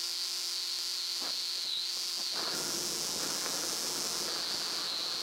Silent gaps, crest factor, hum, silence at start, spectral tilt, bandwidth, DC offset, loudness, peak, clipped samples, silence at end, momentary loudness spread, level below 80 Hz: none; 18 dB; none; 0 s; 0.5 dB/octave; 16 kHz; under 0.1%; -32 LUFS; -18 dBFS; under 0.1%; 0 s; 1 LU; -74 dBFS